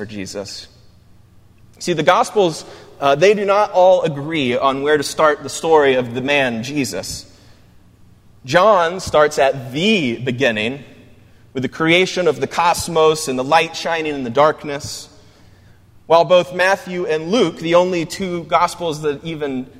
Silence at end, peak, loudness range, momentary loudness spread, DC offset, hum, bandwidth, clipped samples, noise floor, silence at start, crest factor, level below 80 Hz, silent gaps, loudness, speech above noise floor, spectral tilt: 0 s; 0 dBFS; 3 LU; 13 LU; under 0.1%; none; 16 kHz; under 0.1%; -47 dBFS; 0 s; 18 dB; -52 dBFS; none; -16 LUFS; 31 dB; -4.5 dB/octave